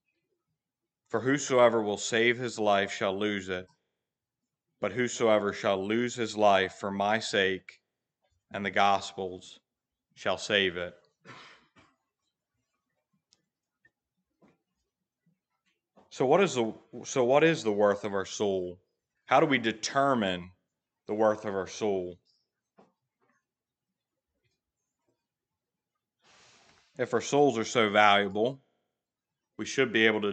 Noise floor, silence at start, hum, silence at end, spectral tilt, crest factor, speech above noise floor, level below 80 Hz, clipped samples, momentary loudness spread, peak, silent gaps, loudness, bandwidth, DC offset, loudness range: -89 dBFS; 1.1 s; none; 0 s; -4 dB/octave; 24 dB; 62 dB; -76 dBFS; under 0.1%; 14 LU; -6 dBFS; none; -28 LUFS; 9.2 kHz; under 0.1%; 7 LU